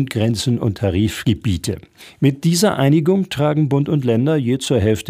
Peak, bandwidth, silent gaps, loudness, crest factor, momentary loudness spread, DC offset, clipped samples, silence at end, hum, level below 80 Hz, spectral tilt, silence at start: -2 dBFS; 16 kHz; none; -17 LUFS; 14 dB; 5 LU; under 0.1%; under 0.1%; 0 s; none; -44 dBFS; -6 dB/octave; 0 s